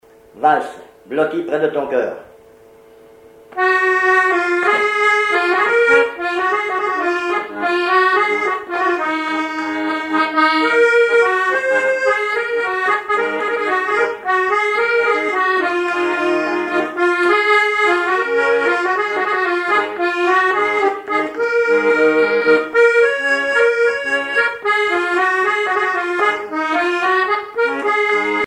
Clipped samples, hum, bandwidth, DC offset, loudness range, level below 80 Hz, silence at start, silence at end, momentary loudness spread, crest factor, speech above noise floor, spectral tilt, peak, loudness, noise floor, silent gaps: under 0.1%; none; 11.5 kHz; under 0.1%; 3 LU; -60 dBFS; 0.35 s; 0 s; 6 LU; 14 dB; 27 dB; -3.5 dB/octave; -2 dBFS; -16 LUFS; -45 dBFS; none